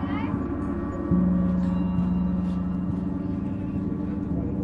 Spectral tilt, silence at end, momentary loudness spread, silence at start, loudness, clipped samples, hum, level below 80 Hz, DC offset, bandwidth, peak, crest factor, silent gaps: -10.5 dB/octave; 0 s; 6 LU; 0 s; -27 LUFS; under 0.1%; none; -38 dBFS; under 0.1%; 4.1 kHz; -10 dBFS; 14 dB; none